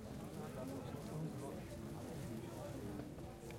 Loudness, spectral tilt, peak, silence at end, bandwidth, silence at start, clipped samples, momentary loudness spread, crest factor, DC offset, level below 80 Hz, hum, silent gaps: -48 LUFS; -6.5 dB/octave; -32 dBFS; 0 s; 16.5 kHz; 0 s; under 0.1%; 3 LU; 14 dB; under 0.1%; -62 dBFS; none; none